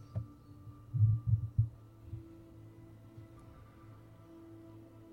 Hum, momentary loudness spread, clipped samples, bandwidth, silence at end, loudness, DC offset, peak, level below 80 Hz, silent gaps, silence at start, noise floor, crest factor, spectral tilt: none; 24 LU; under 0.1%; 2.2 kHz; 0.1 s; -34 LUFS; under 0.1%; -18 dBFS; -54 dBFS; none; 0 s; -55 dBFS; 20 dB; -10.5 dB/octave